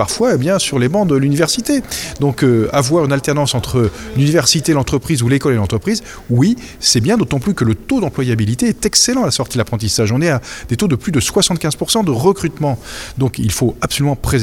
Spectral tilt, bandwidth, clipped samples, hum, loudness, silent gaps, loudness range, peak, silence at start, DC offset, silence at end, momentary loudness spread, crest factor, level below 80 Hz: -4.5 dB/octave; 17.5 kHz; under 0.1%; none; -15 LUFS; none; 2 LU; 0 dBFS; 0 s; under 0.1%; 0 s; 6 LU; 14 dB; -36 dBFS